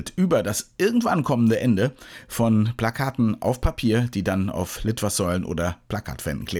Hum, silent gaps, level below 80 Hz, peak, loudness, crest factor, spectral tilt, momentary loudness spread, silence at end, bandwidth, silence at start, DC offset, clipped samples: none; none; -40 dBFS; -8 dBFS; -23 LUFS; 14 dB; -6 dB/octave; 9 LU; 0 s; over 20 kHz; 0 s; under 0.1%; under 0.1%